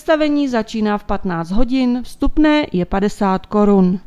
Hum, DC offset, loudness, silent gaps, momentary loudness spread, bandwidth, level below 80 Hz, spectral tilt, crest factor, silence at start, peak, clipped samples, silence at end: none; under 0.1%; -17 LUFS; none; 7 LU; 12 kHz; -30 dBFS; -7 dB/octave; 14 dB; 0.05 s; -2 dBFS; under 0.1%; 0.05 s